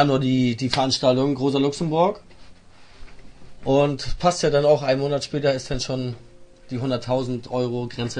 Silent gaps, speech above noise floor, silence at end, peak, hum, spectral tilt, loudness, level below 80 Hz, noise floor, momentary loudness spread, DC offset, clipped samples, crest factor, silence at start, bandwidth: none; 24 dB; 0 s; -2 dBFS; none; -5.5 dB/octave; -22 LUFS; -42 dBFS; -46 dBFS; 9 LU; under 0.1%; under 0.1%; 22 dB; 0 s; 10.5 kHz